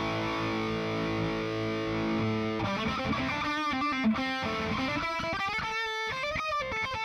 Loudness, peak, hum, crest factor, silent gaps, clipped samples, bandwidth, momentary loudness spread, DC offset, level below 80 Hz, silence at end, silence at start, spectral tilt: -30 LUFS; -18 dBFS; none; 12 dB; none; under 0.1%; 14 kHz; 3 LU; under 0.1%; -52 dBFS; 0 s; 0 s; -5.5 dB/octave